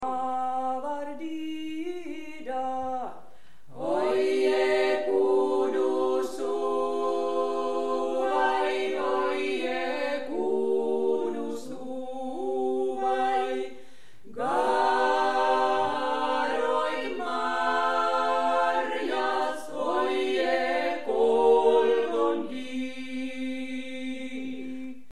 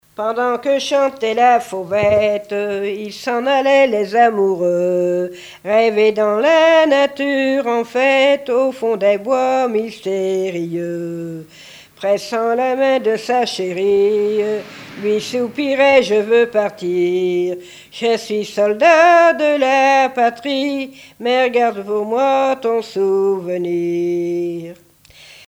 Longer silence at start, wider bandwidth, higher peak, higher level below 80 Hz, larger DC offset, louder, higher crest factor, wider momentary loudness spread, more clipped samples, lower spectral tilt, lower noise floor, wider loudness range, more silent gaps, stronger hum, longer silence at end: second, 0 s vs 0.2 s; second, 12.5 kHz vs 16 kHz; second, -10 dBFS vs 0 dBFS; second, -70 dBFS vs -60 dBFS; first, 1% vs under 0.1%; second, -27 LUFS vs -16 LUFS; about the same, 16 dB vs 16 dB; about the same, 11 LU vs 11 LU; neither; about the same, -4 dB/octave vs -4.5 dB/octave; first, -57 dBFS vs -44 dBFS; about the same, 5 LU vs 5 LU; neither; neither; second, 0.1 s vs 0.75 s